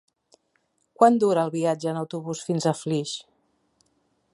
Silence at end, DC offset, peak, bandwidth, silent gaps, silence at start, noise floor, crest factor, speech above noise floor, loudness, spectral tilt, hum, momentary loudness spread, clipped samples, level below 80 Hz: 1.1 s; under 0.1%; -2 dBFS; 11.5 kHz; none; 1 s; -71 dBFS; 22 dB; 48 dB; -24 LUFS; -6 dB/octave; none; 13 LU; under 0.1%; -74 dBFS